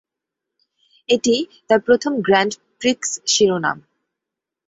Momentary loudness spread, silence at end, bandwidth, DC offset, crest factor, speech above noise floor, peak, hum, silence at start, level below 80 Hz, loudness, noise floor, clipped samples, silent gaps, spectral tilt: 8 LU; 0.9 s; 8 kHz; under 0.1%; 18 dB; 67 dB; -2 dBFS; none; 1.1 s; -60 dBFS; -18 LUFS; -84 dBFS; under 0.1%; none; -3 dB/octave